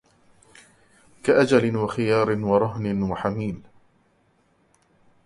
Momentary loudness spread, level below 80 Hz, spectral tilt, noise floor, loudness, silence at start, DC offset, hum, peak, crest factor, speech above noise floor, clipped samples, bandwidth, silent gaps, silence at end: 11 LU; -54 dBFS; -7 dB/octave; -64 dBFS; -22 LUFS; 1.25 s; under 0.1%; none; -4 dBFS; 20 dB; 42 dB; under 0.1%; 11.5 kHz; none; 1.65 s